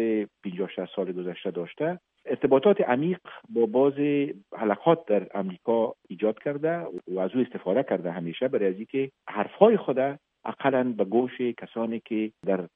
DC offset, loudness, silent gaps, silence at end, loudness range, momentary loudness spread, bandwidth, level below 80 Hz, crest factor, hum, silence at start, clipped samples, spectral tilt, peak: under 0.1%; -27 LUFS; none; 0.1 s; 4 LU; 11 LU; 3.8 kHz; -74 dBFS; 24 dB; none; 0 s; under 0.1%; -10 dB/octave; -4 dBFS